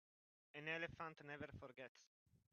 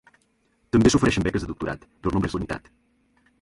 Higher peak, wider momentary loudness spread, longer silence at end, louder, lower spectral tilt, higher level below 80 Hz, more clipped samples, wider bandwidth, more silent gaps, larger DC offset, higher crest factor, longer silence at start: second, -32 dBFS vs -6 dBFS; about the same, 13 LU vs 14 LU; second, 0.45 s vs 0.85 s; second, -52 LUFS vs -23 LUFS; second, -3 dB/octave vs -5.5 dB/octave; second, -78 dBFS vs -40 dBFS; neither; second, 6.8 kHz vs 11.5 kHz; first, 1.89-1.95 s vs none; neither; about the same, 22 dB vs 20 dB; second, 0.55 s vs 0.75 s